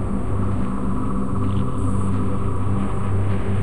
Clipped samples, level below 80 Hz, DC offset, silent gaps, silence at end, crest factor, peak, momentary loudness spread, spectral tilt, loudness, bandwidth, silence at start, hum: under 0.1%; -30 dBFS; 8%; none; 0 s; 12 dB; -10 dBFS; 2 LU; -8.5 dB/octave; -24 LUFS; 10.5 kHz; 0 s; none